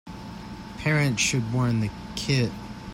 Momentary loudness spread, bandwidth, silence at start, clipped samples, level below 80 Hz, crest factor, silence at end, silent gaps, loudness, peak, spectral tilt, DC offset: 17 LU; 16 kHz; 0.05 s; under 0.1%; -48 dBFS; 16 dB; 0 s; none; -25 LUFS; -10 dBFS; -4.5 dB/octave; under 0.1%